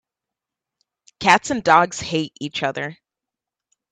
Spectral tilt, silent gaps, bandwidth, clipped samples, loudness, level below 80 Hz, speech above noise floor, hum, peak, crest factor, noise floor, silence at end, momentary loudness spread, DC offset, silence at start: -3.5 dB/octave; none; 11.5 kHz; under 0.1%; -19 LUFS; -58 dBFS; 67 dB; none; 0 dBFS; 22 dB; -86 dBFS; 1 s; 12 LU; under 0.1%; 1.2 s